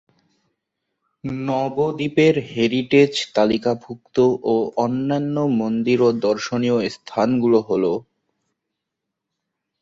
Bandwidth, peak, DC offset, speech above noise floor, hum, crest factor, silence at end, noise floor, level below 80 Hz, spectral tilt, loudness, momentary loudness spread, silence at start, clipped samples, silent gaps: 8 kHz; -2 dBFS; under 0.1%; 62 dB; none; 18 dB; 1.8 s; -81 dBFS; -60 dBFS; -6.5 dB/octave; -20 LUFS; 8 LU; 1.25 s; under 0.1%; none